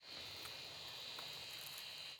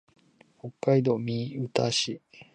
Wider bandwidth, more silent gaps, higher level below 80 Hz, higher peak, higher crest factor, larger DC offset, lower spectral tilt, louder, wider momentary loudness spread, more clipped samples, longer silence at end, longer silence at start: first, 19.5 kHz vs 10 kHz; neither; second, -82 dBFS vs -68 dBFS; second, -30 dBFS vs -8 dBFS; about the same, 20 dB vs 22 dB; neither; second, -0.5 dB/octave vs -5 dB/octave; second, -48 LUFS vs -27 LUFS; second, 2 LU vs 18 LU; neither; about the same, 0 s vs 0.1 s; second, 0 s vs 0.65 s